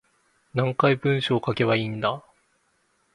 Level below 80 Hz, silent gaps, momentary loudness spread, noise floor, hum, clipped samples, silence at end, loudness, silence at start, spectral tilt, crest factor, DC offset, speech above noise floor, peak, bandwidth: -60 dBFS; none; 7 LU; -68 dBFS; none; under 0.1%; 0.95 s; -24 LUFS; 0.55 s; -7.5 dB/octave; 20 dB; under 0.1%; 45 dB; -6 dBFS; 11 kHz